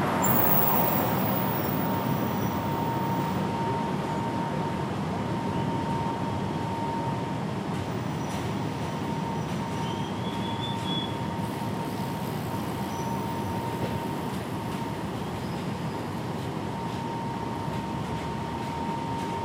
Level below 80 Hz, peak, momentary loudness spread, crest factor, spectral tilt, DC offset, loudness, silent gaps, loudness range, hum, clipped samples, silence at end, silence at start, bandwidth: -52 dBFS; -8 dBFS; 7 LU; 22 dB; -6 dB/octave; under 0.1%; -29 LUFS; none; 5 LU; none; under 0.1%; 0 s; 0 s; 16 kHz